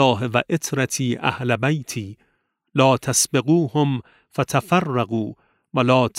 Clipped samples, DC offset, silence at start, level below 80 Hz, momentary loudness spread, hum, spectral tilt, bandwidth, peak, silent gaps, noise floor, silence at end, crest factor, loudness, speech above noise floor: under 0.1%; under 0.1%; 0 s; -60 dBFS; 11 LU; none; -4.5 dB/octave; 16 kHz; -2 dBFS; none; -69 dBFS; 0 s; 18 dB; -21 LUFS; 49 dB